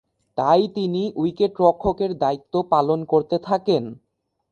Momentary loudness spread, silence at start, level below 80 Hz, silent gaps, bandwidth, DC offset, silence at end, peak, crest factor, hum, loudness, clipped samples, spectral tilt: 6 LU; 0.35 s; -52 dBFS; none; 8.6 kHz; under 0.1%; 0.55 s; -4 dBFS; 18 dB; none; -21 LUFS; under 0.1%; -8 dB/octave